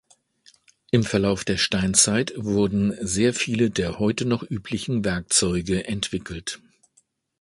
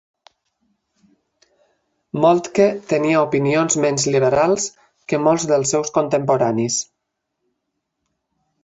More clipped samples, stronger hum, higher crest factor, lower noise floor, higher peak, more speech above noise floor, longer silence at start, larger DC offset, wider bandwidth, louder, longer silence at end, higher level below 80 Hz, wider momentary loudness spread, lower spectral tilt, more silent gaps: neither; neither; about the same, 20 dB vs 18 dB; second, -65 dBFS vs -77 dBFS; about the same, -4 dBFS vs -2 dBFS; second, 42 dB vs 60 dB; second, 0.95 s vs 2.15 s; neither; first, 11.5 kHz vs 8.2 kHz; second, -23 LUFS vs -18 LUFS; second, 0.85 s vs 1.8 s; first, -46 dBFS vs -58 dBFS; first, 10 LU vs 6 LU; about the same, -4 dB/octave vs -4.5 dB/octave; neither